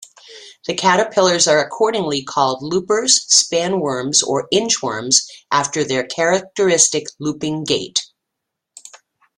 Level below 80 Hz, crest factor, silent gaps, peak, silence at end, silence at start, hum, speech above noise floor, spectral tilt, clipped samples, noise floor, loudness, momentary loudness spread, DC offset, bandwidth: -60 dBFS; 18 dB; none; 0 dBFS; 0.4 s; 0.3 s; none; 62 dB; -2 dB/octave; under 0.1%; -79 dBFS; -16 LUFS; 9 LU; under 0.1%; 15 kHz